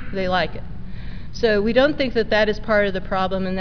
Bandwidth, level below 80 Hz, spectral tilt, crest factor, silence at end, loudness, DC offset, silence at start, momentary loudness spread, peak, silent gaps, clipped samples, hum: 5.4 kHz; -34 dBFS; -6.5 dB/octave; 16 dB; 0 s; -20 LUFS; 3%; 0 s; 18 LU; -6 dBFS; none; under 0.1%; none